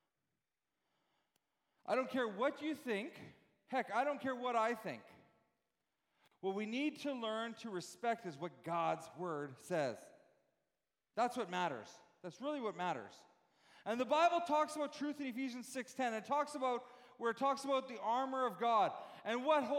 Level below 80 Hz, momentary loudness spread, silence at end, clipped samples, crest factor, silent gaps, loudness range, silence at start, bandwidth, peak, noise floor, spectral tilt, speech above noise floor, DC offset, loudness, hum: under -90 dBFS; 13 LU; 0 s; under 0.1%; 18 dB; none; 5 LU; 1.85 s; 16.5 kHz; -22 dBFS; under -90 dBFS; -4.5 dB/octave; over 51 dB; under 0.1%; -39 LUFS; none